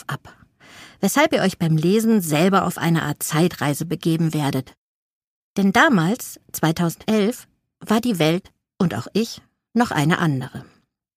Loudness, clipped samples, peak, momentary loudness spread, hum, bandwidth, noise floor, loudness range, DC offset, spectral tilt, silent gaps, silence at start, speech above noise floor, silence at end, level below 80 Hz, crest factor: -20 LUFS; under 0.1%; 0 dBFS; 11 LU; none; 15.5 kHz; -48 dBFS; 3 LU; under 0.1%; -5.5 dB/octave; 4.77-5.56 s; 0.1 s; 29 dB; 0.55 s; -56 dBFS; 20 dB